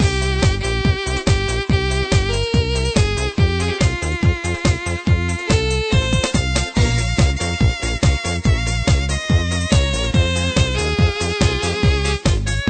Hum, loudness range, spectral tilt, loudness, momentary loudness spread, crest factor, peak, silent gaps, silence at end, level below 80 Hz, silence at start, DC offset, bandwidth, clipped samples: none; 1 LU; -5 dB/octave; -18 LUFS; 2 LU; 16 dB; -2 dBFS; none; 0 s; -22 dBFS; 0 s; under 0.1%; 9.2 kHz; under 0.1%